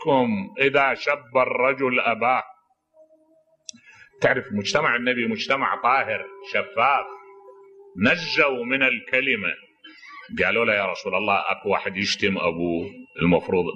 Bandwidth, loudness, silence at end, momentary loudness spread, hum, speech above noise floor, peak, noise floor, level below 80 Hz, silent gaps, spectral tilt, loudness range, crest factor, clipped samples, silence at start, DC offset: 8.8 kHz; -22 LUFS; 0 s; 12 LU; none; 39 dB; -4 dBFS; -61 dBFS; -58 dBFS; none; -5 dB/octave; 3 LU; 18 dB; under 0.1%; 0 s; under 0.1%